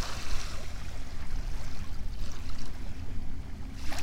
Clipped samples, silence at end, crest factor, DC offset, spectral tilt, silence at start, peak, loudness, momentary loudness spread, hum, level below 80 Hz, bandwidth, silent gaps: under 0.1%; 0 s; 12 dB; under 0.1%; -4 dB/octave; 0 s; -14 dBFS; -41 LUFS; 5 LU; none; -36 dBFS; 11 kHz; none